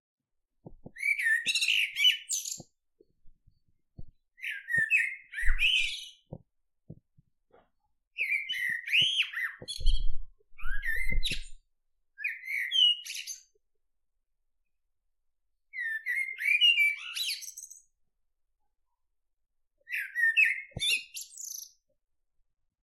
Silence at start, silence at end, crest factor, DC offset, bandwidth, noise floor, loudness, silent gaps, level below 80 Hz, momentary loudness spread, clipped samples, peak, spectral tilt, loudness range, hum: 0.7 s; 1.2 s; 22 dB; under 0.1%; 14 kHz; -78 dBFS; -27 LUFS; 8.07-8.11 s; -40 dBFS; 18 LU; under 0.1%; -10 dBFS; 0.5 dB/octave; 6 LU; none